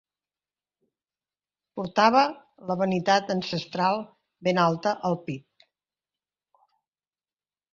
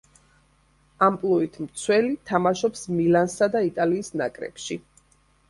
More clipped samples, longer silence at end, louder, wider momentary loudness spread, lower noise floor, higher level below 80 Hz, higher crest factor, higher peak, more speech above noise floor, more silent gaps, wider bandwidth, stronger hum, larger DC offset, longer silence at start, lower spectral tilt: neither; first, 2.35 s vs 0.7 s; about the same, -25 LUFS vs -24 LUFS; first, 17 LU vs 12 LU; first, under -90 dBFS vs -62 dBFS; second, -70 dBFS vs -60 dBFS; about the same, 22 dB vs 18 dB; about the same, -6 dBFS vs -6 dBFS; first, over 66 dB vs 38 dB; neither; second, 7.4 kHz vs 11.5 kHz; first, 50 Hz at -60 dBFS vs none; neither; first, 1.75 s vs 1 s; about the same, -5.5 dB/octave vs -5.5 dB/octave